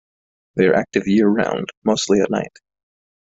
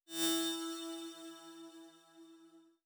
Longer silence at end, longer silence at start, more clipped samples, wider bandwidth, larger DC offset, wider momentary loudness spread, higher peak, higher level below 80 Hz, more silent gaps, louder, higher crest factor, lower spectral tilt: first, 0.85 s vs 0.2 s; first, 0.55 s vs 0.1 s; neither; second, 8 kHz vs over 20 kHz; neither; second, 8 LU vs 26 LU; first, -2 dBFS vs -22 dBFS; first, -56 dBFS vs under -90 dBFS; first, 1.77-1.82 s vs none; first, -18 LUFS vs -38 LUFS; about the same, 16 dB vs 20 dB; first, -5 dB/octave vs -1 dB/octave